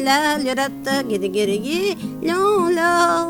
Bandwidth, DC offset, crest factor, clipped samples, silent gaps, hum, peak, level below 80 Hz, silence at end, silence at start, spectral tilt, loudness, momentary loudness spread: 19 kHz; under 0.1%; 14 dB; under 0.1%; none; none; -4 dBFS; -56 dBFS; 0 s; 0 s; -3.5 dB/octave; -19 LUFS; 6 LU